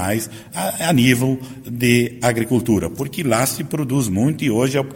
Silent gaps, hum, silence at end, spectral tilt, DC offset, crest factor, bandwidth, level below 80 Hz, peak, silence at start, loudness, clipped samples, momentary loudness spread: none; none; 0 s; -5 dB/octave; under 0.1%; 16 dB; 17 kHz; -48 dBFS; -2 dBFS; 0 s; -19 LUFS; under 0.1%; 9 LU